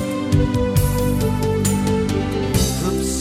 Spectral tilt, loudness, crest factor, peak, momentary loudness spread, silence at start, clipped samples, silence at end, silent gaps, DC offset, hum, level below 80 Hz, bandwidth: -5.5 dB/octave; -19 LUFS; 16 dB; -4 dBFS; 2 LU; 0 s; under 0.1%; 0 s; none; under 0.1%; none; -28 dBFS; 16 kHz